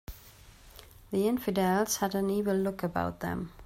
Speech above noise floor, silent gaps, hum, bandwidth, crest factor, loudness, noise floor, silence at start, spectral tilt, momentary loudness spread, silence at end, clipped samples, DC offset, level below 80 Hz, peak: 24 dB; none; none; 16 kHz; 16 dB; -30 LUFS; -54 dBFS; 0.1 s; -5 dB/octave; 8 LU; 0 s; under 0.1%; under 0.1%; -54 dBFS; -14 dBFS